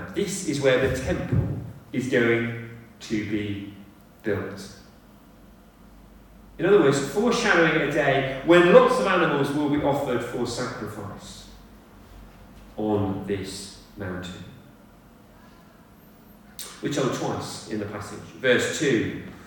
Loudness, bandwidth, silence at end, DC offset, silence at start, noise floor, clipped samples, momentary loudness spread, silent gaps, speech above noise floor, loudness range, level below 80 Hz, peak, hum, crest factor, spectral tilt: -23 LUFS; 18 kHz; 0 s; under 0.1%; 0 s; -51 dBFS; under 0.1%; 19 LU; none; 28 dB; 14 LU; -50 dBFS; -2 dBFS; none; 24 dB; -5 dB/octave